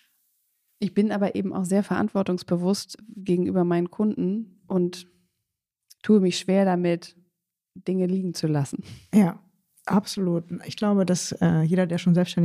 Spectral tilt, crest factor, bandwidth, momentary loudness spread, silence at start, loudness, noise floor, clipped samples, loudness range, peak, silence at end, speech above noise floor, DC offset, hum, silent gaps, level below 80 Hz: -6.5 dB/octave; 16 dB; 14 kHz; 11 LU; 0.8 s; -24 LUFS; -83 dBFS; under 0.1%; 2 LU; -8 dBFS; 0 s; 60 dB; under 0.1%; none; none; -66 dBFS